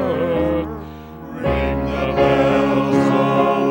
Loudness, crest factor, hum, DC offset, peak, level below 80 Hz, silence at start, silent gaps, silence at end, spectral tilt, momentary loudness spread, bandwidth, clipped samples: -18 LUFS; 16 dB; none; under 0.1%; -2 dBFS; -34 dBFS; 0 s; none; 0 s; -7.5 dB/octave; 16 LU; 16 kHz; under 0.1%